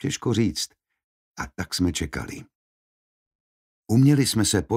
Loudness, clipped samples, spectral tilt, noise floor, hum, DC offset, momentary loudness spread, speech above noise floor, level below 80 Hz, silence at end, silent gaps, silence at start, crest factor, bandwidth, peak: -23 LUFS; under 0.1%; -5 dB/octave; under -90 dBFS; none; under 0.1%; 17 LU; over 67 dB; -46 dBFS; 0 s; 1.04-1.35 s, 2.55-3.83 s; 0 s; 18 dB; 16 kHz; -8 dBFS